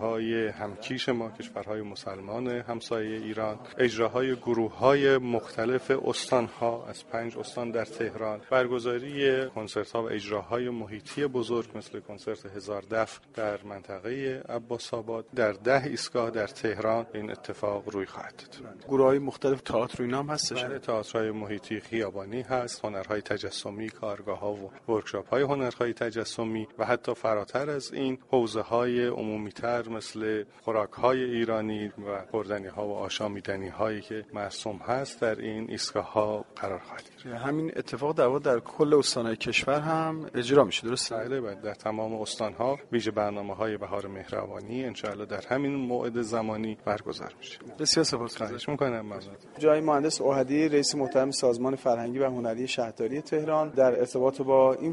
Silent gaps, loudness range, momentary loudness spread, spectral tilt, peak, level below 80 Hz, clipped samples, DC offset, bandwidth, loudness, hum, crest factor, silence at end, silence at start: none; 7 LU; 12 LU; -4.5 dB/octave; -6 dBFS; -64 dBFS; under 0.1%; under 0.1%; 11.5 kHz; -29 LUFS; none; 24 dB; 0 s; 0 s